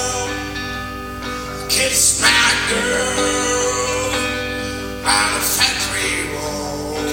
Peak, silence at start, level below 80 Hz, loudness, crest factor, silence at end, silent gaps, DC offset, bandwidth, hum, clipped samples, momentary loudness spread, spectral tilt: 0 dBFS; 0 s; -36 dBFS; -17 LUFS; 18 dB; 0 s; none; under 0.1%; 17.5 kHz; none; under 0.1%; 14 LU; -1.5 dB/octave